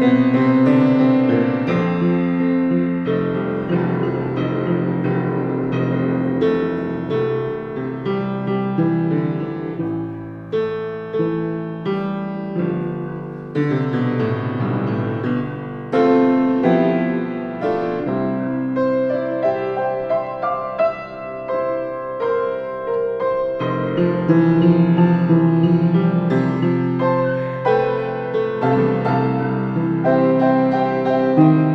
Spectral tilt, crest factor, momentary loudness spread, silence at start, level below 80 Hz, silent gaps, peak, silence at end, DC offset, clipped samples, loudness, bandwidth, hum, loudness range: -10 dB/octave; 18 dB; 10 LU; 0 s; -54 dBFS; none; 0 dBFS; 0 s; under 0.1%; under 0.1%; -19 LUFS; 5.8 kHz; none; 6 LU